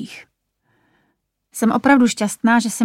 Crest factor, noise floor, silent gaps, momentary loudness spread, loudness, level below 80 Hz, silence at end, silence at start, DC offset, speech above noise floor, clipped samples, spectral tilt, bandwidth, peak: 18 dB; -69 dBFS; none; 16 LU; -16 LUFS; -62 dBFS; 0 s; 0 s; under 0.1%; 53 dB; under 0.1%; -4 dB/octave; 15.5 kHz; -2 dBFS